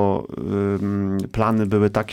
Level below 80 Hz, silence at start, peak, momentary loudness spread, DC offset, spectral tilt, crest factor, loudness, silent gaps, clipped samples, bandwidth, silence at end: -44 dBFS; 0 s; -6 dBFS; 6 LU; under 0.1%; -8.5 dB/octave; 14 dB; -22 LUFS; none; under 0.1%; 13 kHz; 0 s